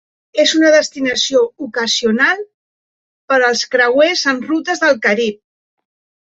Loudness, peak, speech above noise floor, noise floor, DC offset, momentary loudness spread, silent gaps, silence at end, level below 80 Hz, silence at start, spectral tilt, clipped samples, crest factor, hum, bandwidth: -14 LUFS; -2 dBFS; over 76 dB; under -90 dBFS; under 0.1%; 8 LU; 2.54-3.28 s; 0.95 s; -62 dBFS; 0.35 s; -2 dB/octave; under 0.1%; 14 dB; none; 8 kHz